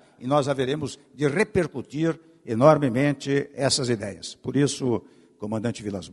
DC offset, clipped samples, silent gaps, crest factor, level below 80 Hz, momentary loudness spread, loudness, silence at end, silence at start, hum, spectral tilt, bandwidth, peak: under 0.1%; under 0.1%; none; 22 dB; -58 dBFS; 13 LU; -24 LUFS; 0 s; 0.2 s; none; -5.5 dB/octave; 11.5 kHz; -2 dBFS